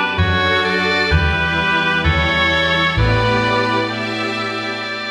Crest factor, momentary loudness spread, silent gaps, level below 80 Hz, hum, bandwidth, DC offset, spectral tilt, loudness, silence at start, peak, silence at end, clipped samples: 14 dB; 6 LU; none; -28 dBFS; none; 10.5 kHz; under 0.1%; -5.5 dB/octave; -16 LUFS; 0 s; -2 dBFS; 0 s; under 0.1%